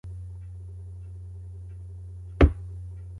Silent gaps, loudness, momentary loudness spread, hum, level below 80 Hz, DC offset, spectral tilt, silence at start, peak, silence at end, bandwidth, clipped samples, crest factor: none; -26 LUFS; 19 LU; none; -32 dBFS; under 0.1%; -9 dB/octave; 0.05 s; -4 dBFS; 0 s; 4.7 kHz; under 0.1%; 26 dB